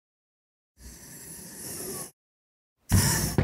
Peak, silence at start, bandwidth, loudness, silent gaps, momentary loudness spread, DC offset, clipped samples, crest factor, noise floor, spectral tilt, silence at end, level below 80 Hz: -10 dBFS; 0.8 s; 16 kHz; -27 LUFS; 2.13-2.76 s; 21 LU; under 0.1%; under 0.1%; 22 dB; -46 dBFS; -4 dB/octave; 0 s; -42 dBFS